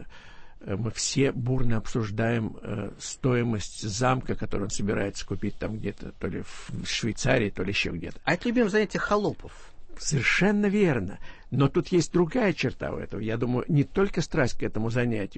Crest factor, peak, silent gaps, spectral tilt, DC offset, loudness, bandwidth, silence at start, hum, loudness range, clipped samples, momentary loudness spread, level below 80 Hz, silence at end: 18 dB; -8 dBFS; none; -5.5 dB/octave; under 0.1%; -27 LUFS; 8.8 kHz; 0 s; none; 4 LU; under 0.1%; 11 LU; -40 dBFS; 0 s